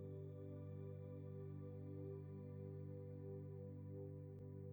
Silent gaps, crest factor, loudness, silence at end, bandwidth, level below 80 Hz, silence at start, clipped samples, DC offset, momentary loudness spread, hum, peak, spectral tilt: none; 12 dB; -54 LUFS; 0 s; over 20 kHz; -86 dBFS; 0 s; under 0.1%; under 0.1%; 1 LU; 50 Hz at -75 dBFS; -40 dBFS; -11.5 dB/octave